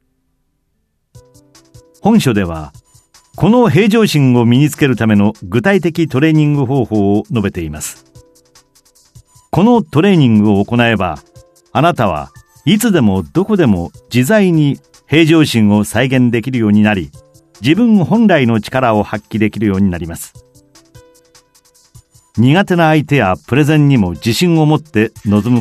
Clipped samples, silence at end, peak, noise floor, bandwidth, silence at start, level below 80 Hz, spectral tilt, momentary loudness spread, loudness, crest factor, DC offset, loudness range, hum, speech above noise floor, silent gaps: under 0.1%; 0 s; 0 dBFS; -64 dBFS; 14 kHz; 2.05 s; -42 dBFS; -6.5 dB/octave; 10 LU; -12 LUFS; 12 dB; under 0.1%; 6 LU; none; 53 dB; none